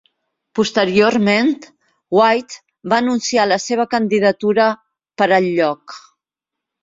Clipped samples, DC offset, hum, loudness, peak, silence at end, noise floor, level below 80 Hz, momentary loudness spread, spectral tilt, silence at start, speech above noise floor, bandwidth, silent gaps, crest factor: under 0.1%; under 0.1%; none; -16 LUFS; -2 dBFS; 0.85 s; -84 dBFS; -60 dBFS; 14 LU; -4.5 dB/octave; 0.55 s; 68 dB; 7.8 kHz; none; 16 dB